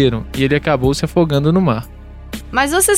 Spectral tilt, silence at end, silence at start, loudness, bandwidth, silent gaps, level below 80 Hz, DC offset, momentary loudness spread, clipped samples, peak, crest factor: -5 dB/octave; 0 s; 0 s; -16 LUFS; 16.5 kHz; none; -32 dBFS; under 0.1%; 14 LU; under 0.1%; 0 dBFS; 14 dB